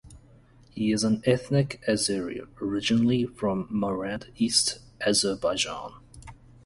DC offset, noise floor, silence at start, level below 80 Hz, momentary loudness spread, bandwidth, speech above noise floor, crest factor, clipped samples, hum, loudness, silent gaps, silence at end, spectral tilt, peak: under 0.1%; -55 dBFS; 0.05 s; -54 dBFS; 10 LU; 11.5 kHz; 29 dB; 20 dB; under 0.1%; none; -26 LUFS; none; 0.3 s; -4 dB/octave; -8 dBFS